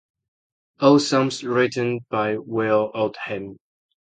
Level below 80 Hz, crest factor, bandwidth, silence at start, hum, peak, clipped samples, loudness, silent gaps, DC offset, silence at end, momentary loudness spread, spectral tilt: -66 dBFS; 20 dB; 9.4 kHz; 0.8 s; none; -4 dBFS; under 0.1%; -21 LUFS; none; under 0.1%; 0.65 s; 13 LU; -5.5 dB/octave